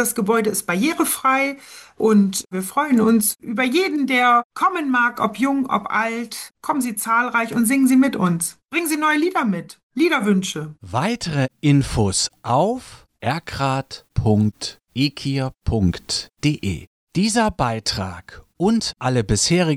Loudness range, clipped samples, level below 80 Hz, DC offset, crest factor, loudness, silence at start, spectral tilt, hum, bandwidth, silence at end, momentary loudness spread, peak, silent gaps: 4 LU; under 0.1%; -42 dBFS; under 0.1%; 14 dB; -20 LUFS; 0 s; -4.5 dB/octave; none; 16 kHz; 0 s; 10 LU; -6 dBFS; 4.44-4.50 s, 9.83-9.90 s, 16.87-17.07 s